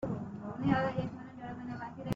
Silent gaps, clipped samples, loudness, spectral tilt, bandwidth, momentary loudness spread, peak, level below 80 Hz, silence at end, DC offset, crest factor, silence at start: none; under 0.1%; -36 LUFS; -6.5 dB/octave; 7.6 kHz; 13 LU; -14 dBFS; -60 dBFS; 0 s; under 0.1%; 22 dB; 0 s